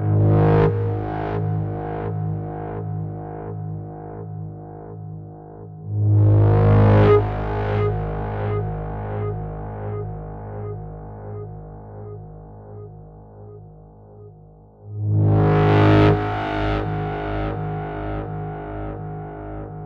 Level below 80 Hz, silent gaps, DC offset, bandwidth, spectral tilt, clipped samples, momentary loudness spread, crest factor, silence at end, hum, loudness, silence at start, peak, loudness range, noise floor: -36 dBFS; none; under 0.1%; 4.9 kHz; -10 dB/octave; under 0.1%; 22 LU; 16 dB; 0 s; none; -21 LUFS; 0 s; -6 dBFS; 18 LU; -46 dBFS